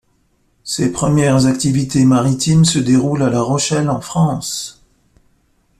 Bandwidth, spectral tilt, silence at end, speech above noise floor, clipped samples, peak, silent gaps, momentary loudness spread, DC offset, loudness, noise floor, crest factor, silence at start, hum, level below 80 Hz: 14 kHz; -5.5 dB/octave; 1.1 s; 46 dB; under 0.1%; -2 dBFS; none; 10 LU; under 0.1%; -15 LUFS; -60 dBFS; 14 dB; 0.65 s; none; -44 dBFS